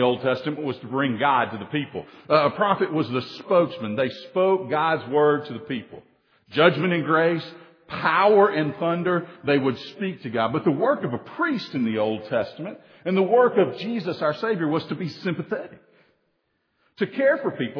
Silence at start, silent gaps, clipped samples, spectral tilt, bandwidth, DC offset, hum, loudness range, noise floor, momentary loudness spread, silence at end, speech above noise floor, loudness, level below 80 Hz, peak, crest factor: 0 s; none; under 0.1%; -8 dB/octave; 5.4 kHz; under 0.1%; none; 4 LU; -72 dBFS; 12 LU; 0 s; 49 dB; -23 LUFS; -70 dBFS; -2 dBFS; 22 dB